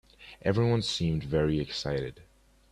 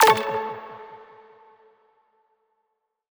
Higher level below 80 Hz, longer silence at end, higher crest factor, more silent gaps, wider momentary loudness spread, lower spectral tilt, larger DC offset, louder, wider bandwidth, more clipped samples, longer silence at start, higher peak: first, -48 dBFS vs -66 dBFS; second, 0.5 s vs 2.2 s; second, 18 dB vs 24 dB; neither; second, 8 LU vs 26 LU; first, -6 dB/octave vs -2 dB/octave; neither; second, -29 LUFS vs -24 LUFS; second, 11.5 kHz vs over 20 kHz; neither; first, 0.2 s vs 0 s; second, -12 dBFS vs -2 dBFS